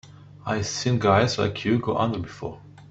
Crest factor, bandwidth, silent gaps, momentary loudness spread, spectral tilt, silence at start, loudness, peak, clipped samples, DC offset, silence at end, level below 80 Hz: 20 dB; 8.2 kHz; none; 16 LU; -5.5 dB/octave; 0.05 s; -24 LUFS; -4 dBFS; under 0.1%; under 0.1%; 0.05 s; -54 dBFS